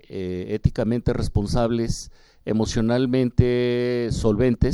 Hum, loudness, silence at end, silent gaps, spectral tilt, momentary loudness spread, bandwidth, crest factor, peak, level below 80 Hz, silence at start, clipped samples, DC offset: none; -23 LUFS; 0 s; none; -7 dB/octave; 9 LU; 12 kHz; 20 dB; -2 dBFS; -32 dBFS; 0.1 s; under 0.1%; under 0.1%